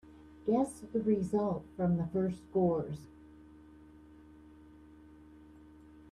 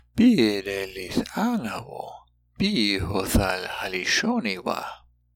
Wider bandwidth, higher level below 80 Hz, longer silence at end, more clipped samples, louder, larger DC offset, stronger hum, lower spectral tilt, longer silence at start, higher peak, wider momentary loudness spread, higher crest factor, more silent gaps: second, 12 kHz vs 17.5 kHz; second, -62 dBFS vs -40 dBFS; second, 0 s vs 0.4 s; neither; second, -33 LUFS vs -24 LUFS; neither; neither; first, -9 dB/octave vs -4.5 dB/octave; about the same, 0.05 s vs 0.15 s; second, -18 dBFS vs -8 dBFS; second, 9 LU vs 13 LU; about the same, 18 dB vs 18 dB; neither